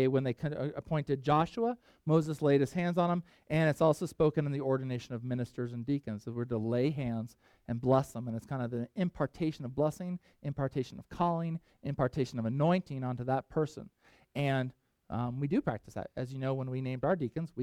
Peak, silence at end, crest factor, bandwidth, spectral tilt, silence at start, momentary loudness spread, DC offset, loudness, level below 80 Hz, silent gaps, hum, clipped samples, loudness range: -14 dBFS; 0 s; 18 dB; 14 kHz; -8 dB/octave; 0 s; 11 LU; under 0.1%; -33 LUFS; -60 dBFS; none; none; under 0.1%; 5 LU